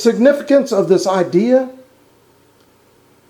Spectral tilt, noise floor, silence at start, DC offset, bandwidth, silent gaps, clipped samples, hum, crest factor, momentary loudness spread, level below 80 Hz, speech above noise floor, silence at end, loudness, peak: -6 dB/octave; -52 dBFS; 0 s; under 0.1%; 18 kHz; none; under 0.1%; none; 16 dB; 3 LU; -66 dBFS; 39 dB; 1.6 s; -14 LUFS; 0 dBFS